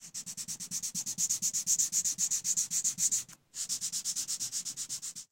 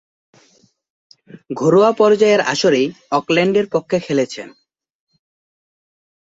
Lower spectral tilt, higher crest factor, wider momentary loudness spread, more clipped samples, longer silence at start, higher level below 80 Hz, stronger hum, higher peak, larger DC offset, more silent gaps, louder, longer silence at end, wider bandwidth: second, 1.5 dB/octave vs -5 dB/octave; about the same, 18 dB vs 16 dB; about the same, 11 LU vs 12 LU; neither; second, 0 s vs 1.35 s; second, -76 dBFS vs -62 dBFS; neither; second, -16 dBFS vs -2 dBFS; neither; neither; second, -31 LUFS vs -15 LUFS; second, 0.1 s vs 1.85 s; first, 17 kHz vs 8 kHz